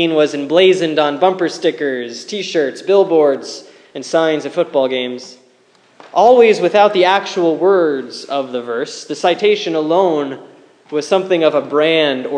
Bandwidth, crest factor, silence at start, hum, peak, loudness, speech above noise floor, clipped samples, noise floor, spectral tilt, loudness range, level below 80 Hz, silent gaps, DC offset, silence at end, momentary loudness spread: 10 kHz; 14 dB; 0 s; none; 0 dBFS; -15 LUFS; 38 dB; under 0.1%; -52 dBFS; -4.5 dB/octave; 4 LU; -72 dBFS; none; under 0.1%; 0 s; 12 LU